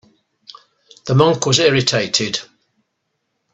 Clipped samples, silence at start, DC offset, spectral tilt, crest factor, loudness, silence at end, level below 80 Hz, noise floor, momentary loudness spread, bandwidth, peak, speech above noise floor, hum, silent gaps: under 0.1%; 1.05 s; under 0.1%; -4 dB/octave; 20 dB; -15 LUFS; 1.1 s; -54 dBFS; -72 dBFS; 11 LU; 8.4 kHz; 0 dBFS; 57 dB; none; none